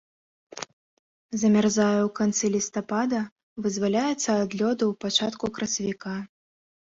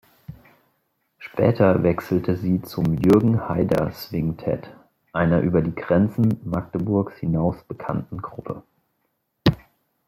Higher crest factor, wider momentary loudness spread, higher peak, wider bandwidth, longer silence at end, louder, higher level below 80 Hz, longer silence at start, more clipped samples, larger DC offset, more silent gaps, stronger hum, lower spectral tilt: about the same, 18 dB vs 18 dB; about the same, 15 LU vs 15 LU; second, -8 dBFS vs -4 dBFS; second, 7.8 kHz vs 15.5 kHz; first, 0.65 s vs 0.5 s; second, -25 LUFS vs -22 LUFS; second, -64 dBFS vs -48 dBFS; first, 0.55 s vs 0.3 s; neither; neither; first, 0.73-1.29 s, 3.32-3.36 s, 3.43-3.56 s vs none; neither; second, -4 dB/octave vs -8.5 dB/octave